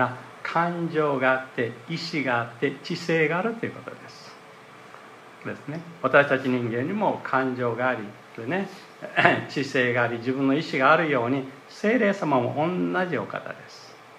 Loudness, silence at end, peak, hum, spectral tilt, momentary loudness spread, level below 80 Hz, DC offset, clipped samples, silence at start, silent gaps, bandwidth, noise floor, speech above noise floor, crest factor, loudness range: -24 LUFS; 0 s; 0 dBFS; none; -6.5 dB/octave; 19 LU; -74 dBFS; under 0.1%; under 0.1%; 0 s; none; 12.5 kHz; -47 dBFS; 22 dB; 24 dB; 5 LU